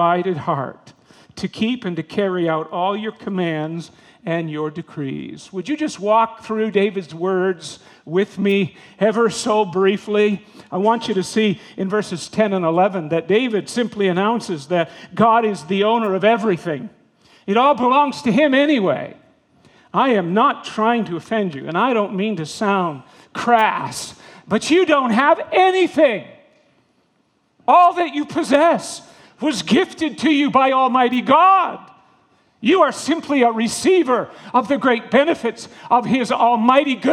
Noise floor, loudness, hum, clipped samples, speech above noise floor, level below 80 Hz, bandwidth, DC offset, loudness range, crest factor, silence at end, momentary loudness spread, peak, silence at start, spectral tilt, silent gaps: -63 dBFS; -18 LUFS; none; under 0.1%; 46 dB; -66 dBFS; 13 kHz; under 0.1%; 6 LU; 18 dB; 0 s; 12 LU; 0 dBFS; 0 s; -5 dB/octave; none